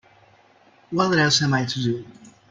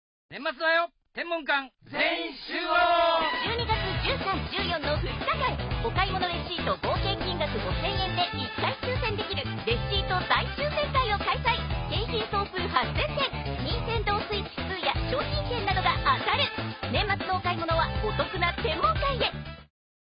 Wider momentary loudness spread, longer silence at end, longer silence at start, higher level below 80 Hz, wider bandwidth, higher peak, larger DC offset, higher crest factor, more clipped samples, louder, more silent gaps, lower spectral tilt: first, 11 LU vs 6 LU; second, 0.2 s vs 0.4 s; first, 0.9 s vs 0.3 s; second, -58 dBFS vs -38 dBFS; first, 9.6 kHz vs 5.4 kHz; about the same, -6 dBFS vs -8 dBFS; neither; about the same, 18 dB vs 20 dB; neither; first, -21 LUFS vs -27 LUFS; neither; second, -4 dB/octave vs -9.5 dB/octave